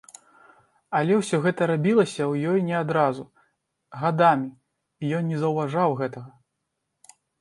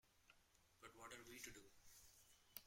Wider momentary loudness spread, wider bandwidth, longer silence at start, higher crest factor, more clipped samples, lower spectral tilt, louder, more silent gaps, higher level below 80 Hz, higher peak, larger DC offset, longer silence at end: about the same, 12 LU vs 10 LU; second, 11.5 kHz vs 16.5 kHz; first, 0.9 s vs 0.05 s; second, 20 dB vs 30 dB; neither; first, -7 dB/octave vs -2 dB/octave; first, -23 LUFS vs -61 LUFS; neither; first, -70 dBFS vs -80 dBFS; first, -6 dBFS vs -34 dBFS; neither; first, 1.1 s vs 0 s